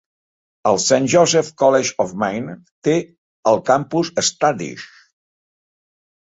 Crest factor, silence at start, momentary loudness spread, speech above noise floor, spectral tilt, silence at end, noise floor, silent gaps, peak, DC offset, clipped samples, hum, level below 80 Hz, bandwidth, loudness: 18 dB; 0.65 s; 12 LU; over 73 dB; -3.5 dB/octave; 1.55 s; under -90 dBFS; 2.72-2.82 s, 3.18-3.43 s; -2 dBFS; under 0.1%; under 0.1%; none; -60 dBFS; 8 kHz; -18 LUFS